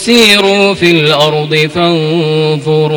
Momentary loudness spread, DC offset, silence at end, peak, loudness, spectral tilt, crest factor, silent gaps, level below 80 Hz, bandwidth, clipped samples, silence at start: 6 LU; under 0.1%; 0 s; 0 dBFS; -8 LUFS; -4.5 dB/octave; 8 dB; none; -46 dBFS; over 20 kHz; 0.8%; 0 s